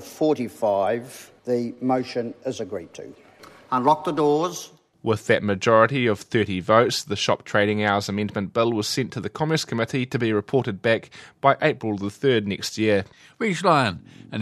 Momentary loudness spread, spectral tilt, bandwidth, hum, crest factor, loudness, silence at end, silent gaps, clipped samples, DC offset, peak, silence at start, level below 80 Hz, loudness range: 12 LU; -5 dB/octave; 14 kHz; none; 22 dB; -23 LUFS; 0 s; none; under 0.1%; under 0.1%; -2 dBFS; 0 s; -64 dBFS; 5 LU